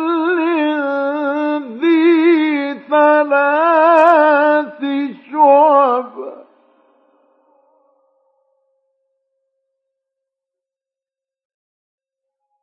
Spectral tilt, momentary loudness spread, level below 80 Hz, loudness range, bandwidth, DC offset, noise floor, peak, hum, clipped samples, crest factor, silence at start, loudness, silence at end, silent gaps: -5.5 dB/octave; 11 LU; -80 dBFS; 5 LU; 5.6 kHz; under 0.1%; -89 dBFS; 0 dBFS; none; under 0.1%; 16 dB; 0 s; -13 LUFS; 6.2 s; none